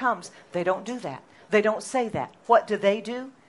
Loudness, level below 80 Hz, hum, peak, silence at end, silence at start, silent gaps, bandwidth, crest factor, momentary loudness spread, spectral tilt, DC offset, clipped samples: -26 LUFS; -68 dBFS; none; -6 dBFS; 0.2 s; 0 s; none; 11.5 kHz; 20 dB; 13 LU; -4.5 dB/octave; under 0.1%; under 0.1%